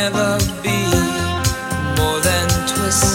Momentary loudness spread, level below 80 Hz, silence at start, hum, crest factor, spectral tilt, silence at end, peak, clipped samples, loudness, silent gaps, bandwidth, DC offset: 4 LU; -30 dBFS; 0 s; none; 16 dB; -3.5 dB/octave; 0 s; 0 dBFS; under 0.1%; -17 LUFS; none; 17 kHz; under 0.1%